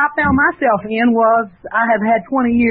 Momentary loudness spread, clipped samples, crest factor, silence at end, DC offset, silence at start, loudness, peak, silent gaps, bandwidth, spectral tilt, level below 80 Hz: 4 LU; under 0.1%; 12 dB; 0 s; under 0.1%; 0 s; -15 LUFS; -4 dBFS; none; 4.3 kHz; -12 dB/octave; -42 dBFS